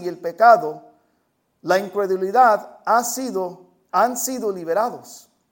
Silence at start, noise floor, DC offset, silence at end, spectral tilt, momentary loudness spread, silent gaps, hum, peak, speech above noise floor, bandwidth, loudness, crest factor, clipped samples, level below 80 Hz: 0 s; -68 dBFS; under 0.1%; 0.35 s; -3.5 dB/octave; 16 LU; none; none; -2 dBFS; 49 dB; 17 kHz; -19 LUFS; 20 dB; under 0.1%; -70 dBFS